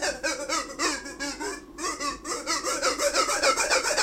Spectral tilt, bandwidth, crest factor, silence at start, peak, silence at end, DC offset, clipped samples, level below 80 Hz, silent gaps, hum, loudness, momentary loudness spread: 0 dB/octave; 16 kHz; 20 dB; 0 s; -8 dBFS; 0 s; under 0.1%; under 0.1%; -52 dBFS; none; none; -26 LUFS; 10 LU